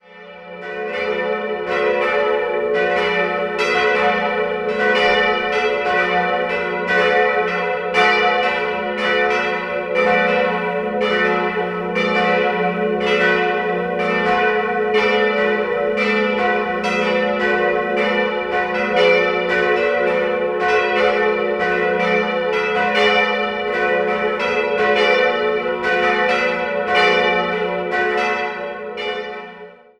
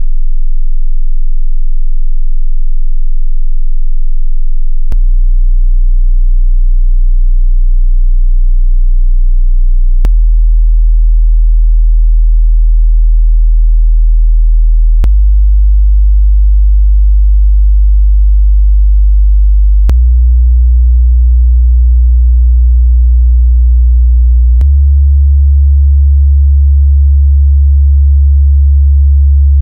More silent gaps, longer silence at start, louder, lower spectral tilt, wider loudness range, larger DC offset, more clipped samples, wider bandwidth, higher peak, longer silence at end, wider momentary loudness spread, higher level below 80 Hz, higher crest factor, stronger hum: neither; about the same, 0.1 s vs 0 s; second, -17 LUFS vs -10 LUFS; second, -5 dB/octave vs -17 dB/octave; second, 1 LU vs 9 LU; neither; neither; first, 10 kHz vs 0.6 kHz; about the same, -2 dBFS vs -2 dBFS; first, 0.25 s vs 0 s; second, 6 LU vs 11 LU; second, -52 dBFS vs -6 dBFS; first, 16 dB vs 4 dB; neither